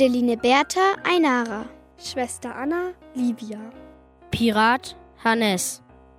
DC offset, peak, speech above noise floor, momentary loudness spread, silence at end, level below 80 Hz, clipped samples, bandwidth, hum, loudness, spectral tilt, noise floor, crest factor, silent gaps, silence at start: under 0.1%; -6 dBFS; 26 dB; 18 LU; 0.4 s; -54 dBFS; under 0.1%; 16 kHz; none; -22 LUFS; -3.5 dB/octave; -48 dBFS; 18 dB; none; 0 s